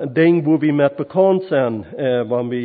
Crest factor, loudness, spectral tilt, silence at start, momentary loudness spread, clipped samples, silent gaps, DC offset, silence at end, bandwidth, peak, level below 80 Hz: 14 dB; -17 LUFS; -12.5 dB/octave; 0 s; 6 LU; under 0.1%; none; under 0.1%; 0 s; 4.7 kHz; -2 dBFS; -62 dBFS